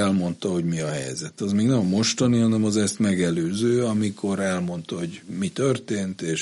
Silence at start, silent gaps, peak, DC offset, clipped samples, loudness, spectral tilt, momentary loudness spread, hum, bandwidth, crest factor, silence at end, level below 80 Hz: 0 s; none; -8 dBFS; under 0.1%; under 0.1%; -24 LUFS; -5.5 dB/octave; 9 LU; none; 11.5 kHz; 14 dB; 0 s; -60 dBFS